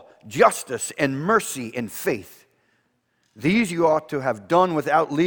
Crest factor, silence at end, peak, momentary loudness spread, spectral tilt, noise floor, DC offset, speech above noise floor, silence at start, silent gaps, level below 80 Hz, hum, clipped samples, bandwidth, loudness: 20 dB; 0 s; -2 dBFS; 10 LU; -5 dB/octave; -69 dBFS; under 0.1%; 47 dB; 0.25 s; none; -60 dBFS; none; under 0.1%; over 20 kHz; -22 LUFS